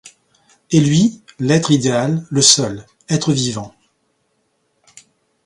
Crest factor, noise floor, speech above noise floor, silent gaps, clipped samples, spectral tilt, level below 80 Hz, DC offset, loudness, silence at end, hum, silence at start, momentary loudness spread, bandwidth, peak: 18 dB; -66 dBFS; 51 dB; none; under 0.1%; -4 dB/octave; -54 dBFS; under 0.1%; -15 LUFS; 1.75 s; none; 0.05 s; 14 LU; 11.5 kHz; 0 dBFS